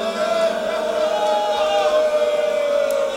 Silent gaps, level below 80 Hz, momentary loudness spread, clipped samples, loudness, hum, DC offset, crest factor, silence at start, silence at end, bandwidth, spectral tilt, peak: none; -58 dBFS; 3 LU; under 0.1%; -19 LUFS; none; under 0.1%; 12 dB; 0 s; 0 s; 16 kHz; -2.5 dB/octave; -8 dBFS